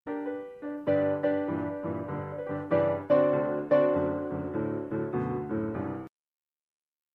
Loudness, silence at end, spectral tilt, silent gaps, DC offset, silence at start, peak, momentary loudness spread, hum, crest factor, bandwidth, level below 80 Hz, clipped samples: -29 LUFS; 1.05 s; -10 dB/octave; none; under 0.1%; 0.05 s; -12 dBFS; 11 LU; none; 18 dB; 4.4 kHz; -64 dBFS; under 0.1%